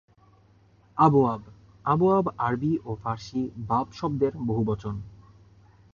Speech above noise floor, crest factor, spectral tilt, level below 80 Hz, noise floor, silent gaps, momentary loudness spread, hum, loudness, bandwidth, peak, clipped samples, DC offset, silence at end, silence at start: 34 dB; 22 dB; -9 dB/octave; -54 dBFS; -58 dBFS; none; 14 LU; none; -26 LUFS; 7.2 kHz; -6 dBFS; under 0.1%; under 0.1%; 0.8 s; 0.95 s